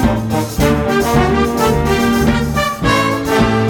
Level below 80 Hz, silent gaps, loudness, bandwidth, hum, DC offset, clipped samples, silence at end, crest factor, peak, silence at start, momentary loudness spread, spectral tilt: -26 dBFS; none; -14 LUFS; 18 kHz; none; under 0.1%; under 0.1%; 0 s; 12 dB; 0 dBFS; 0 s; 3 LU; -5.5 dB/octave